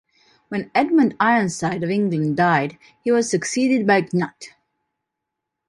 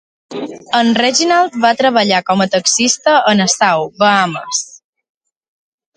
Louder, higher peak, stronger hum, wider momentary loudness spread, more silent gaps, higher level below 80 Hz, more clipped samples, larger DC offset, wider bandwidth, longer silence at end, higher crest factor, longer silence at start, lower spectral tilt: second, -20 LUFS vs -12 LUFS; second, -4 dBFS vs 0 dBFS; neither; about the same, 12 LU vs 11 LU; neither; about the same, -64 dBFS vs -60 dBFS; neither; neither; first, 11.5 kHz vs 10 kHz; about the same, 1.2 s vs 1.3 s; about the same, 16 dB vs 14 dB; first, 0.5 s vs 0.3 s; first, -5.5 dB/octave vs -2.5 dB/octave